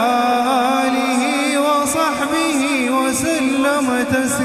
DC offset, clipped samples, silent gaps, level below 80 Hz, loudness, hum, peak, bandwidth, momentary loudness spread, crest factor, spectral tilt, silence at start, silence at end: under 0.1%; under 0.1%; none; -52 dBFS; -17 LUFS; none; -4 dBFS; 15.5 kHz; 2 LU; 12 dB; -3 dB/octave; 0 s; 0 s